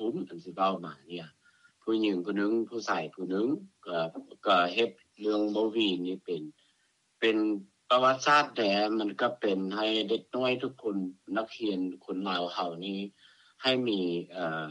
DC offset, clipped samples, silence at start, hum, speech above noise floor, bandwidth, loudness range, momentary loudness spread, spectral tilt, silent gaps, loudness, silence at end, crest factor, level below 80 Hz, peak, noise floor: under 0.1%; under 0.1%; 0 s; none; 42 dB; 9.8 kHz; 5 LU; 12 LU; -5 dB/octave; none; -30 LUFS; 0 s; 20 dB; -82 dBFS; -12 dBFS; -72 dBFS